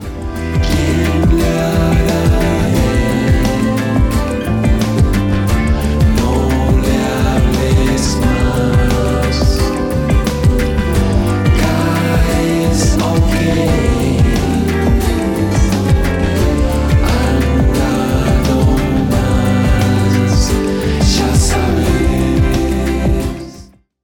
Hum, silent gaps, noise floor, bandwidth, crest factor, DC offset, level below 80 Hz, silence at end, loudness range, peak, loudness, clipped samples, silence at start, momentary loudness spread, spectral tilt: none; none; -38 dBFS; 19 kHz; 12 dB; under 0.1%; -18 dBFS; 0.4 s; 1 LU; -2 dBFS; -14 LUFS; under 0.1%; 0 s; 3 LU; -6 dB/octave